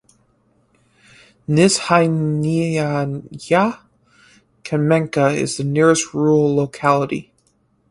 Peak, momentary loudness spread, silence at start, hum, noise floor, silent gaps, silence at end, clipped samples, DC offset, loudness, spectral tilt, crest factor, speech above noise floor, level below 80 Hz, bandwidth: 0 dBFS; 11 LU; 1.5 s; none; -61 dBFS; none; 0.7 s; under 0.1%; under 0.1%; -17 LUFS; -5.5 dB/octave; 18 dB; 45 dB; -56 dBFS; 11.5 kHz